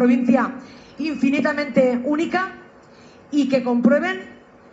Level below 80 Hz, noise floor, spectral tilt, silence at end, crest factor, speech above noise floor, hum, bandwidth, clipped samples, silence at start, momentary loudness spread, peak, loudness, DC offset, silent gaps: -62 dBFS; -47 dBFS; -6.5 dB/octave; 0.35 s; 16 dB; 28 dB; none; 7.8 kHz; under 0.1%; 0 s; 11 LU; -4 dBFS; -20 LUFS; under 0.1%; none